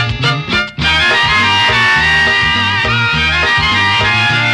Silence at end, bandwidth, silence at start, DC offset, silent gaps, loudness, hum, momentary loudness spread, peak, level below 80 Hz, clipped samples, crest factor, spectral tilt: 0 s; 12.5 kHz; 0 s; 0.2%; none; -10 LUFS; none; 4 LU; -4 dBFS; -30 dBFS; under 0.1%; 8 dB; -3.5 dB/octave